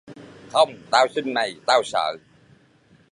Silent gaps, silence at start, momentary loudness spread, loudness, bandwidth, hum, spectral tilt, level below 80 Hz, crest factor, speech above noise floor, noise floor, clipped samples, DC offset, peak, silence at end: none; 0.1 s; 6 LU; -21 LUFS; 11 kHz; none; -2.5 dB/octave; -70 dBFS; 22 dB; 35 dB; -57 dBFS; under 0.1%; under 0.1%; -2 dBFS; 0.95 s